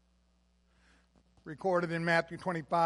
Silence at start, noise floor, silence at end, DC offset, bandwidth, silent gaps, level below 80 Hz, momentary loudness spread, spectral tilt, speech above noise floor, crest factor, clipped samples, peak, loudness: 1.45 s; -70 dBFS; 0 s; under 0.1%; 11.5 kHz; none; -68 dBFS; 16 LU; -6 dB/octave; 39 dB; 22 dB; under 0.1%; -14 dBFS; -32 LUFS